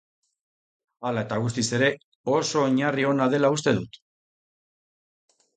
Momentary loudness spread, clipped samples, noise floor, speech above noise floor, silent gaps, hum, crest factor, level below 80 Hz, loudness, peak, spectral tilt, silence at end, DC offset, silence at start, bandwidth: 8 LU; under 0.1%; under -90 dBFS; over 67 dB; 2.04-2.24 s; none; 18 dB; -62 dBFS; -24 LUFS; -8 dBFS; -5 dB/octave; 1.7 s; under 0.1%; 1 s; 9.4 kHz